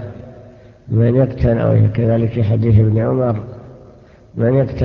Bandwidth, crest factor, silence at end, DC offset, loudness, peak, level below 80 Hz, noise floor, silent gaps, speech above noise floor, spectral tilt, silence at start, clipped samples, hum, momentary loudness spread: 4.9 kHz; 14 dB; 0 s; under 0.1%; -15 LUFS; -2 dBFS; -32 dBFS; -43 dBFS; none; 29 dB; -11.5 dB/octave; 0 s; under 0.1%; none; 19 LU